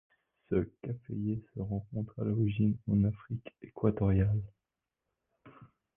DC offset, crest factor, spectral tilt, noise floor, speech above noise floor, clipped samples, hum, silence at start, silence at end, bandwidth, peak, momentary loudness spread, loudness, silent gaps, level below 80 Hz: under 0.1%; 18 dB; -12.5 dB/octave; -88 dBFS; 57 dB; under 0.1%; none; 0.5 s; 0.3 s; 3.6 kHz; -14 dBFS; 13 LU; -33 LUFS; none; -50 dBFS